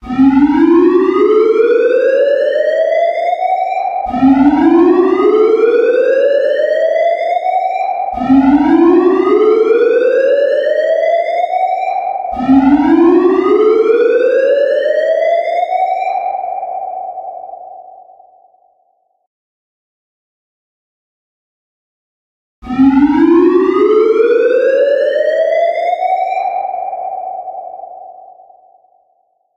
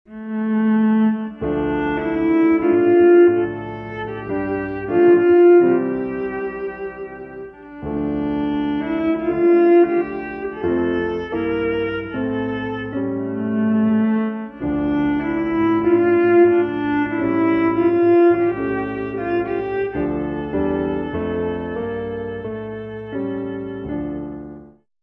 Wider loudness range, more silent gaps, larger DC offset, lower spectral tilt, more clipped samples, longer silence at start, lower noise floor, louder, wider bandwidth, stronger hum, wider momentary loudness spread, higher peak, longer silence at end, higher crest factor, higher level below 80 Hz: about the same, 9 LU vs 8 LU; first, 19.27-22.62 s vs none; neither; second, -7 dB/octave vs -10 dB/octave; neither; about the same, 0.05 s vs 0.1 s; first, -59 dBFS vs -42 dBFS; first, -11 LUFS vs -19 LUFS; first, 7 kHz vs 3.7 kHz; neither; second, 12 LU vs 15 LU; first, 0 dBFS vs -4 dBFS; first, 1.45 s vs 0.35 s; about the same, 12 dB vs 14 dB; about the same, -46 dBFS vs -46 dBFS